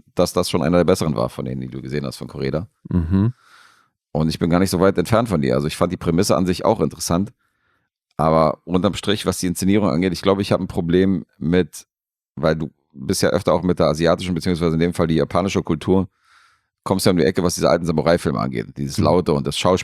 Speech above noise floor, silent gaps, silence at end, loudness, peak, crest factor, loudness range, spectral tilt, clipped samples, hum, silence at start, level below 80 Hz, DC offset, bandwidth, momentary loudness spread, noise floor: 49 dB; 12.29-12.35 s; 0 s; -19 LUFS; -2 dBFS; 18 dB; 2 LU; -6 dB/octave; under 0.1%; none; 0.15 s; -44 dBFS; under 0.1%; 15.5 kHz; 10 LU; -68 dBFS